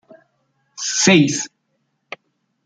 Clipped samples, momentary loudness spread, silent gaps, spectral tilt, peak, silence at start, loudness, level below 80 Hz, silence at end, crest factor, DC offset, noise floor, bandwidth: under 0.1%; 24 LU; none; -3.5 dB/octave; -2 dBFS; 0.8 s; -16 LUFS; -62 dBFS; 1.2 s; 20 dB; under 0.1%; -70 dBFS; 10 kHz